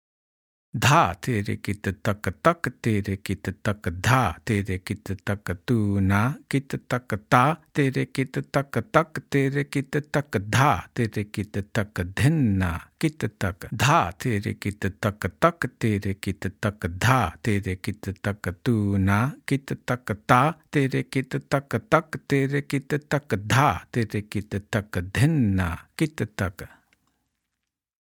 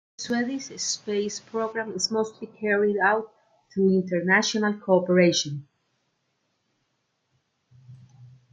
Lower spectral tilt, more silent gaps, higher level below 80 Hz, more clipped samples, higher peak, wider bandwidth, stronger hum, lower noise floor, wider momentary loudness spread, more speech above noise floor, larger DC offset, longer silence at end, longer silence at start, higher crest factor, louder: first, -6 dB/octave vs -4 dB/octave; neither; first, -52 dBFS vs -74 dBFS; neither; first, 0 dBFS vs -6 dBFS; first, 18.5 kHz vs 9.4 kHz; neither; first, -83 dBFS vs -75 dBFS; about the same, 9 LU vs 11 LU; first, 59 dB vs 50 dB; neither; first, 1.35 s vs 0.25 s; first, 0.75 s vs 0.2 s; about the same, 24 dB vs 20 dB; about the same, -25 LUFS vs -24 LUFS